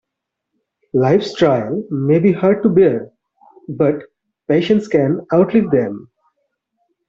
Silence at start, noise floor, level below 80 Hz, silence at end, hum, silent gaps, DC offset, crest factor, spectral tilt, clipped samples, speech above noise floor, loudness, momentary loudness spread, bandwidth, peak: 0.95 s; -80 dBFS; -56 dBFS; 1.1 s; none; none; under 0.1%; 14 dB; -8 dB/octave; under 0.1%; 65 dB; -16 LUFS; 12 LU; 7.6 kHz; -2 dBFS